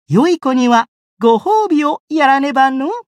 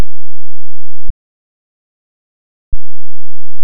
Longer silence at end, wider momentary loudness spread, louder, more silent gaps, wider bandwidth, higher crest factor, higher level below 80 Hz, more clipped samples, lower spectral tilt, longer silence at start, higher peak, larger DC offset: first, 0.2 s vs 0 s; about the same, 6 LU vs 4 LU; first, -14 LUFS vs -33 LUFS; second, 0.88-1.17 s, 2.00-2.08 s vs 1.10-2.72 s; first, 12 kHz vs 2.1 kHz; first, 12 dB vs 4 dB; second, -70 dBFS vs -30 dBFS; second, under 0.1% vs 50%; second, -6 dB/octave vs -17 dB/octave; about the same, 0.1 s vs 0 s; about the same, -2 dBFS vs 0 dBFS; neither